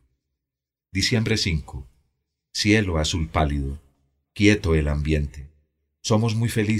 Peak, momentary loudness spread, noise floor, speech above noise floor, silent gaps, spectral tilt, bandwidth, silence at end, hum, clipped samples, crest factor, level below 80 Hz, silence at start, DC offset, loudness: -4 dBFS; 14 LU; -87 dBFS; 66 dB; none; -5 dB/octave; 15 kHz; 0 s; none; under 0.1%; 20 dB; -34 dBFS; 0.95 s; under 0.1%; -23 LUFS